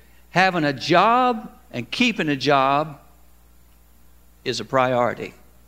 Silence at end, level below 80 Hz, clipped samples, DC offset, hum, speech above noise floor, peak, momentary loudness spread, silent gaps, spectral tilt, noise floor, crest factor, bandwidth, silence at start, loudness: 0.4 s; -54 dBFS; under 0.1%; 0.2%; none; 33 dB; -2 dBFS; 15 LU; none; -5 dB/octave; -53 dBFS; 22 dB; 16 kHz; 0.35 s; -20 LUFS